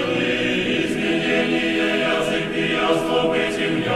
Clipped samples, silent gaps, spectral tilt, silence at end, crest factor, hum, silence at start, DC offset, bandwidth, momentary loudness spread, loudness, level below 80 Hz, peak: under 0.1%; none; -4.5 dB/octave; 0 s; 14 dB; none; 0 s; under 0.1%; 13 kHz; 2 LU; -20 LUFS; -48 dBFS; -6 dBFS